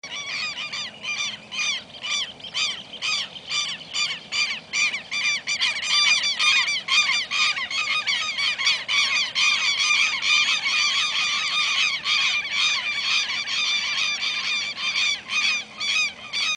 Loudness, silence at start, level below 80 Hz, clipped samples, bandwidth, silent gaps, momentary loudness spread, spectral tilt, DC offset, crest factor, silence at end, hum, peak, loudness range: -21 LUFS; 0.05 s; -68 dBFS; under 0.1%; 10.5 kHz; none; 8 LU; 2 dB/octave; under 0.1%; 18 dB; 0 s; none; -6 dBFS; 6 LU